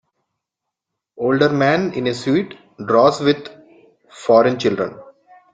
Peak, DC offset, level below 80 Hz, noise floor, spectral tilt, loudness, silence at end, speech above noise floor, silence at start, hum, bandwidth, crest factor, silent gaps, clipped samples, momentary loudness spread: -2 dBFS; under 0.1%; -60 dBFS; -82 dBFS; -6 dB/octave; -17 LUFS; 0.5 s; 66 dB; 1.2 s; none; 9.2 kHz; 18 dB; none; under 0.1%; 13 LU